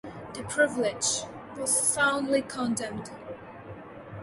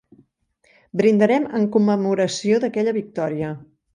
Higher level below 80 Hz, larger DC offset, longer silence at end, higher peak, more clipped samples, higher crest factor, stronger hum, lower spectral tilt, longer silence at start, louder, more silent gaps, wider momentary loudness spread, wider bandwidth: about the same, -62 dBFS vs -64 dBFS; neither; second, 0 s vs 0.3 s; second, -10 dBFS vs -4 dBFS; neither; about the same, 20 dB vs 16 dB; neither; second, -2.5 dB/octave vs -6 dB/octave; second, 0.05 s vs 0.95 s; second, -27 LUFS vs -20 LUFS; neither; first, 20 LU vs 11 LU; first, 12 kHz vs 10 kHz